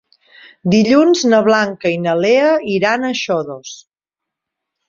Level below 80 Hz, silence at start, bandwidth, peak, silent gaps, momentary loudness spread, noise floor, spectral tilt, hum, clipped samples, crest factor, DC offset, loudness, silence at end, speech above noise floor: -58 dBFS; 0.65 s; 7.6 kHz; -2 dBFS; none; 12 LU; -83 dBFS; -5 dB/octave; none; under 0.1%; 14 dB; under 0.1%; -14 LUFS; 1.15 s; 70 dB